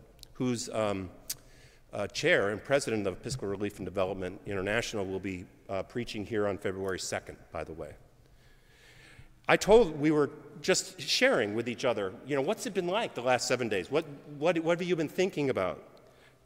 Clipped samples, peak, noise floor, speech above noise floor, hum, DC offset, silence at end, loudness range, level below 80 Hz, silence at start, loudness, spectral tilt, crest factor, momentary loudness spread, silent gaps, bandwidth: under 0.1%; -8 dBFS; -59 dBFS; 28 dB; none; under 0.1%; 0.6 s; 9 LU; -54 dBFS; 0.2 s; -30 LUFS; -4 dB/octave; 24 dB; 13 LU; none; 16 kHz